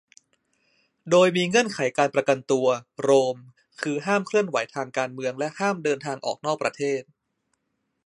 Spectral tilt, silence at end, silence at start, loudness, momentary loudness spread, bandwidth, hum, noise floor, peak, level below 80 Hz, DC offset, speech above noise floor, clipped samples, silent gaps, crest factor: -4.5 dB/octave; 1.05 s; 1.05 s; -24 LUFS; 10 LU; 11.5 kHz; none; -77 dBFS; -6 dBFS; -74 dBFS; under 0.1%; 53 dB; under 0.1%; none; 20 dB